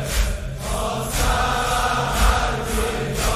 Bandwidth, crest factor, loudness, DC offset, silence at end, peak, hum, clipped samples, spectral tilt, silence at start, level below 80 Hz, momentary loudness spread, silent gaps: 15.5 kHz; 18 dB; -22 LUFS; under 0.1%; 0 s; -4 dBFS; none; under 0.1%; -3.5 dB/octave; 0 s; -24 dBFS; 6 LU; none